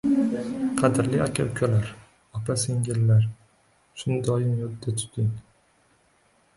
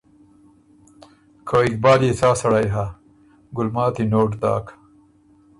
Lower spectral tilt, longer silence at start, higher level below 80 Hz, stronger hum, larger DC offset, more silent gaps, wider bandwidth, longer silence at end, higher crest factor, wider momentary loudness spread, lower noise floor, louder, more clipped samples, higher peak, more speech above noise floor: about the same, -6.5 dB/octave vs -6.5 dB/octave; second, 0.05 s vs 1.45 s; second, -54 dBFS vs -48 dBFS; neither; neither; neither; about the same, 11.5 kHz vs 11.5 kHz; first, 1.15 s vs 0.85 s; about the same, 18 dB vs 18 dB; second, 12 LU vs 15 LU; first, -63 dBFS vs -54 dBFS; second, -25 LUFS vs -19 LUFS; neither; second, -8 dBFS vs -2 dBFS; about the same, 39 dB vs 36 dB